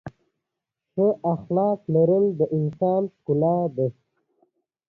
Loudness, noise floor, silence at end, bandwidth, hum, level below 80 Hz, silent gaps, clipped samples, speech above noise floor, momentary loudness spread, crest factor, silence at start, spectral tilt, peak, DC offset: -23 LUFS; -84 dBFS; 0.95 s; 4.1 kHz; none; -62 dBFS; none; under 0.1%; 62 dB; 8 LU; 16 dB; 0.05 s; -12.5 dB/octave; -8 dBFS; under 0.1%